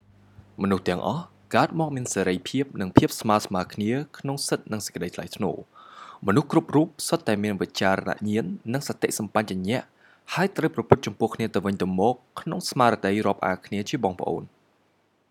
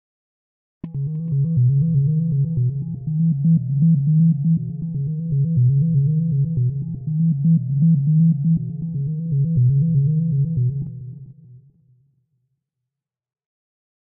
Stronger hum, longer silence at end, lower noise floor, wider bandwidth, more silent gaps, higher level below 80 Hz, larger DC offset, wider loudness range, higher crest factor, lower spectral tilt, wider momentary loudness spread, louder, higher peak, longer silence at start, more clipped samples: neither; second, 0.85 s vs 2.5 s; second, -66 dBFS vs -85 dBFS; first, 17.5 kHz vs 0.7 kHz; neither; second, -58 dBFS vs -48 dBFS; neither; about the same, 2 LU vs 4 LU; first, 26 dB vs 10 dB; second, -5.5 dB/octave vs -20.5 dB/octave; about the same, 9 LU vs 10 LU; second, -25 LUFS vs -19 LUFS; first, 0 dBFS vs -8 dBFS; second, 0.6 s vs 0.85 s; neither